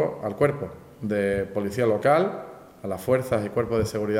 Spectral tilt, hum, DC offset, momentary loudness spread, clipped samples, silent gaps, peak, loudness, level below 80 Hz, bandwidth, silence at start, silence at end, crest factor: -7 dB/octave; none; under 0.1%; 15 LU; under 0.1%; none; -8 dBFS; -25 LUFS; -54 dBFS; 16 kHz; 0 s; 0 s; 18 dB